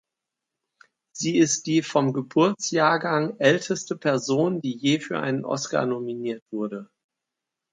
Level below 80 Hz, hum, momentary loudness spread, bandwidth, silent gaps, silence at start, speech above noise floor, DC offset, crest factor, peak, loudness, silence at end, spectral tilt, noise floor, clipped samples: -72 dBFS; none; 10 LU; 9.6 kHz; 6.42-6.46 s; 1.15 s; 62 dB; under 0.1%; 20 dB; -4 dBFS; -24 LUFS; 0.9 s; -4.5 dB/octave; -86 dBFS; under 0.1%